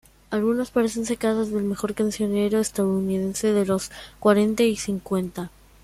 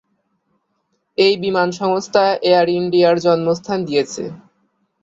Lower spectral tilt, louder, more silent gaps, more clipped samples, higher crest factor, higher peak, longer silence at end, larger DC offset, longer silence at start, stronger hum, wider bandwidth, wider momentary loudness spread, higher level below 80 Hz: about the same, -5.5 dB/octave vs -5 dB/octave; second, -23 LUFS vs -16 LUFS; neither; neither; about the same, 18 dB vs 16 dB; second, -6 dBFS vs 0 dBFS; second, 0.35 s vs 0.65 s; neither; second, 0.3 s vs 1.2 s; neither; first, 15 kHz vs 7.8 kHz; about the same, 7 LU vs 9 LU; first, -52 dBFS vs -60 dBFS